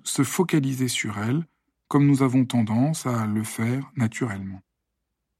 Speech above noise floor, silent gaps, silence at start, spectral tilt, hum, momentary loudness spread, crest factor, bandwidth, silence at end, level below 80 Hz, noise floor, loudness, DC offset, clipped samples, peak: 57 dB; none; 0.05 s; -5.5 dB/octave; none; 10 LU; 16 dB; 16 kHz; 0.8 s; -68 dBFS; -80 dBFS; -24 LUFS; under 0.1%; under 0.1%; -8 dBFS